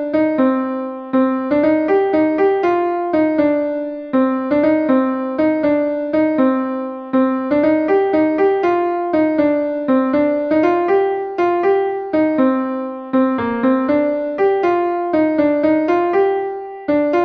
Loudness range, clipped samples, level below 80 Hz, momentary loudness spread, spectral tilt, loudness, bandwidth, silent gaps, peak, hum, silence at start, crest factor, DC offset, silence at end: 1 LU; under 0.1%; -56 dBFS; 5 LU; -8 dB/octave; -17 LUFS; 5.2 kHz; none; -4 dBFS; none; 0 s; 12 dB; under 0.1%; 0 s